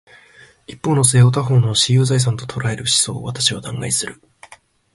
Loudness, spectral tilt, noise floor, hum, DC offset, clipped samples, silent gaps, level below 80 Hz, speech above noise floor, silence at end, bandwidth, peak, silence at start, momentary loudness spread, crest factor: -16 LUFS; -4 dB/octave; -47 dBFS; none; under 0.1%; under 0.1%; none; -50 dBFS; 31 dB; 0.8 s; 11.5 kHz; 0 dBFS; 0.7 s; 10 LU; 18 dB